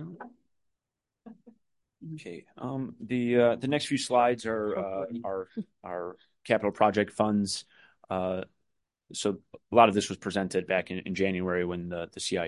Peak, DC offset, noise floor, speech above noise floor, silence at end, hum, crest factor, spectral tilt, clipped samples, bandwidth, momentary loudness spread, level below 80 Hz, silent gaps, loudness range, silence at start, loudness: -4 dBFS; under 0.1%; -88 dBFS; 59 dB; 0 s; none; 26 dB; -5 dB/octave; under 0.1%; 11.5 kHz; 18 LU; -60 dBFS; none; 3 LU; 0 s; -29 LUFS